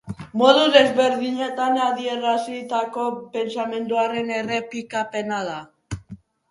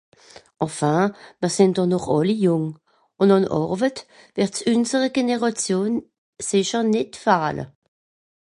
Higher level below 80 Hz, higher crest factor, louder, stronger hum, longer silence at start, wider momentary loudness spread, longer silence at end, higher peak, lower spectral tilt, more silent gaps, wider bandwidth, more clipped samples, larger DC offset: first, -54 dBFS vs -60 dBFS; about the same, 22 dB vs 18 dB; about the same, -21 LUFS vs -21 LUFS; neither; second, 0.05 s vs 0.6 s; first, 15 LU vs 10 LU; second, 0.35 s vs 0.7 s; first, 0 dBFS vs -4 dBFS; about the same, -4.5 dB/octave vs -5.5 dB/octave; second, none vs 6.18-6.33 s; about the same, 11.5 kHz vs 11.5 kHz; neither; neither